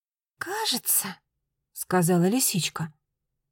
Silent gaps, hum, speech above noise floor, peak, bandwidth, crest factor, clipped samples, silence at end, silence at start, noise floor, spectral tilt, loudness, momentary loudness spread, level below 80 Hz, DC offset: none; none; 56 dB; -10 dBFS; 17 kHz; 16 dB; under 0.1%; 0.6 s; 0.4 s; -81 dBFS; -3.5 dB/octave; -24 LUFS; 16 LU; -70 dBFS; under 0.1%